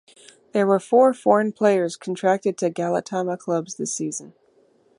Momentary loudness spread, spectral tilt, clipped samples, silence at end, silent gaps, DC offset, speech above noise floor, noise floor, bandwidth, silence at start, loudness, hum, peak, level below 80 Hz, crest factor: 10 LU; -5 dB/octave; under 0.1%; 0.7 s; none; under 0.1%; 38 dB; -59 dBFS; 11.5 kHz; 0.55 s; -22 LUFS; none; -2 dBFS; -74 dBFS; 20 dB